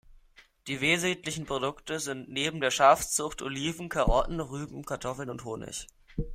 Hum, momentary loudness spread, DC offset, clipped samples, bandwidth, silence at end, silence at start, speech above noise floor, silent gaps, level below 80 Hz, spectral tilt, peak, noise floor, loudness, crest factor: none; 16 LU; under 0.1%; under 0.1%; 16 kHz; 0 s; 0.1 s; 29 dB; none; -42 dBFS; -3.5 dB/octave; -8 dBFS; -59 dBFS; -29 LUFS; 22 dB